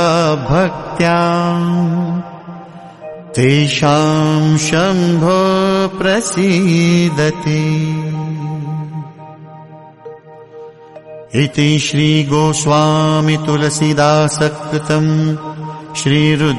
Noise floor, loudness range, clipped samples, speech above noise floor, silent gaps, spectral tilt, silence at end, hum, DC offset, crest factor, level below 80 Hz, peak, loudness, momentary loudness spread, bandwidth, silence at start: -36 dBFS; 8 LU; under 0.1%; 23 dB; none; -5.5 dB/octave; 0 s; none; under 0.1%; 14 dB; -44 dBFS; 0 dBFS; -14 LUFS; 17 LU; 11.5 kHz; 0 s